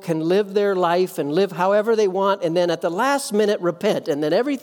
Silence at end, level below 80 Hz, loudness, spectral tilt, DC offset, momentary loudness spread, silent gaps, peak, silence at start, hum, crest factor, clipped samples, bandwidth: 0.05 s; -76 dBFS; -20 LUFS; -5 dB/octave; under 0.1%; 3 LU; none; -6 dBFS; 0 s; none; 14 dB; under 0.1%; 19 kHz